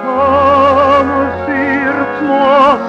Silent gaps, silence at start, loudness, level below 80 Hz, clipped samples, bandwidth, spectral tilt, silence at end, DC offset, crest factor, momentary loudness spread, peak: none; 0 s; -11 LUFS; -44 dBFS; under 0.1%; 7.4 kHz; -6.5 dB/octave; 0 s; under 0.1%; 10 dB; 7 LU; -2 dBFS